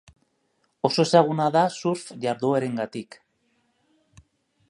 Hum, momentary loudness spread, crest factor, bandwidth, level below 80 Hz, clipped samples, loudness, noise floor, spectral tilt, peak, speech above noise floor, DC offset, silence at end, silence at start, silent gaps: none; 13 LU; 22 dB; 11.5 kHz; -68 dBFS; under 0.1%; -23 LUFS; -71 dBFS; -5.5 dB/octave; -4 dBFS; 48 dB; under 0.1%; 1.65 s; 0.85 s; none